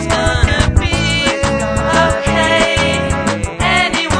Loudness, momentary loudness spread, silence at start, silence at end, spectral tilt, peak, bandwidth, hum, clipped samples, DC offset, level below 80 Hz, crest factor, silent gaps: -13 LUFS; 4 LU; 0 s; 0 s; -4.5 dB/octave; 0 dBFS; 10.5 kHz; none; under 0.1%; under 0.1%; -22 dBFS; 14 dB; none